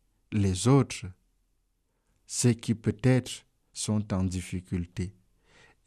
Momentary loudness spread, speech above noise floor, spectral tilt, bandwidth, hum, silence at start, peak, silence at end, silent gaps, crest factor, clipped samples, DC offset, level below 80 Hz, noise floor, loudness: 15 LU; 47 dB; -5.5 dB/octave; 13.5 kHz; none; 0.3 s; -12 dBFS; 0.75 s; none; 18 dB; under 0.1%; under 0.1%; -56 dBFS; -74 dBFS; -29 LUFS